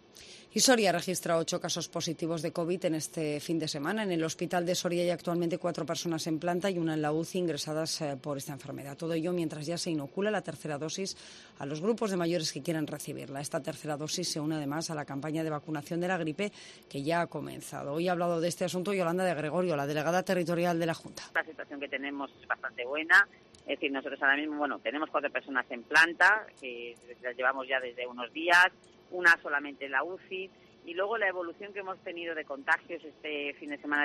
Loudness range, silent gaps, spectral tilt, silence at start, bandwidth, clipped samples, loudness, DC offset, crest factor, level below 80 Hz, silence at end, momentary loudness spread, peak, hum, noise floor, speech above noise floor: 6 LU; none; -4 dB/octave; 0.15 s; 13 kHz; under 0.1%; -31 LUFS; under 0.1%; 22 dB; -74 dBFS; 0 s; 15 LU; -10 dBFS; none; -53 dBFS; 21 dB